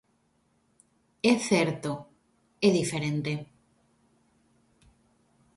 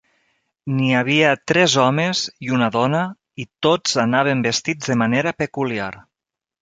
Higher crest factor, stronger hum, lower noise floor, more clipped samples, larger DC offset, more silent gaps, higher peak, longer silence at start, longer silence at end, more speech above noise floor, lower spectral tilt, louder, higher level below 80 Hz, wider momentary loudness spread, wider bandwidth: about the same, 22 dB vs 18 dB; neither; second, -70 dBFS vs -87 dBFS; neither; neither; neither; second, -10 dBFS vs -2 dBFS; first, 1.25 s vs 0.65 s; first, 2.15 s vs 0.6 s; second, 44 dB vs 69 dB; about the same, -5 dB/octave vs -4.5 dB/octave; second, -27 LUFS vs -18 LUFS; second, -68 dBFS vs -58 dBFS; about the same, 12 LU vs 11 LU; first, 11.5 kHz vs 9.4 kHz